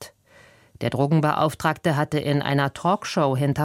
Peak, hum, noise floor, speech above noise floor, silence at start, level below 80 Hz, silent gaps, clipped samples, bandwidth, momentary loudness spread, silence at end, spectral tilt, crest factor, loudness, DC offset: -6 dBFS; none; -53 dBFS; 31 dB; 0 s; -56 dBFS; none; under 0.1%; 15.5 kHz; 5 LU; 0 s; -6.5 dB/octave; 18 dB; -23 LUFS; under 0.1%